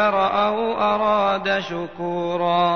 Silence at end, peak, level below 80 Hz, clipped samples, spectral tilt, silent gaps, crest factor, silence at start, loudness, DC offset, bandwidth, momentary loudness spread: 0 s; -6 dBFS; -56 dBFS; under 0.1%; -6 dB/octave; none; 14 dB; 0 s; -21 LUFS; 0.4%; 6.6 kHz; 8 LU